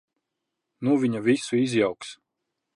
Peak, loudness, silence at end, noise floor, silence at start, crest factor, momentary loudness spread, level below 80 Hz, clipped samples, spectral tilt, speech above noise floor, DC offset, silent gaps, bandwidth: -10 dBFS; -24 LUFS; 0.6 s; -83 dBFS; 0.8 s; 18 dB; 12 LU; -70 dBFS; under 0.1%; -5.5 dB/octave; 59 dB; under 0.1%; none; 11 kHz